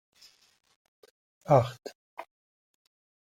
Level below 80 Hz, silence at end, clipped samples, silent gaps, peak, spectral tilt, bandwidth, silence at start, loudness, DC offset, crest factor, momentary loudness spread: -68 dBFS; 1.05 s; under 0.1%; 1.95-2.17 s; -8 dBFS; -7.5 dB/octave; 14.5 kHz; 1.5 s; -26 LUFS; under 0.1%; 26 dB; 23 LU